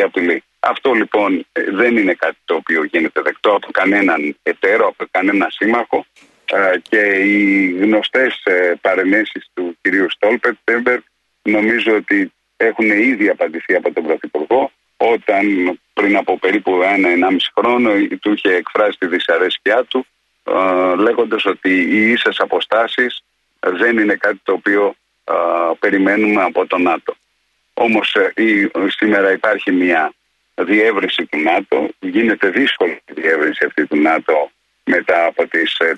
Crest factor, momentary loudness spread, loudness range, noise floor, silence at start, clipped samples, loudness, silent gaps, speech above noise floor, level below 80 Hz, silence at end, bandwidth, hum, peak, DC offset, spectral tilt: 14 dB; 7 LU; 2 LU; -64 dBFS; 0 s; under 0.1%; -15 LUFS; none; 49 dB; -64 dBFS; 0 s; 9.2 kHz; none; -2 dBFS; under 0.1%; -5.5 dB/octave